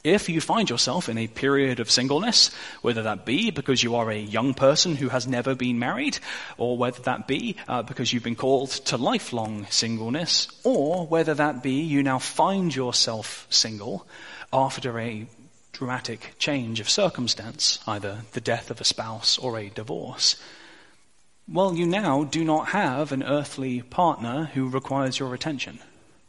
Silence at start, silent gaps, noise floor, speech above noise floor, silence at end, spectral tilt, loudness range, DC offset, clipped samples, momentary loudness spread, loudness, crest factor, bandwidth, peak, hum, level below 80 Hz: 0.05 s; none; -64 dBFS; 39 dB; 0.45 s; -3.5 dB/octave; 5 LU; 0.2%; under 0.1%; 10 LU; -24 LUFS; 20 dB; 11.5 kHz; -4 dBFS; none; -62 dBFS